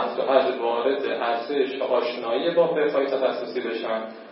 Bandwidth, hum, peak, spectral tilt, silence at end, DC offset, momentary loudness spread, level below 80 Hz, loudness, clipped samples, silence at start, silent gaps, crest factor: 5.8 kHz; none; -6 dBFS; -9 dB/octave; 0 s; under 0.1%; 7 LU; -88 dBFS; -24 LUFS; under 0.1%; 0 s; none; 18 dB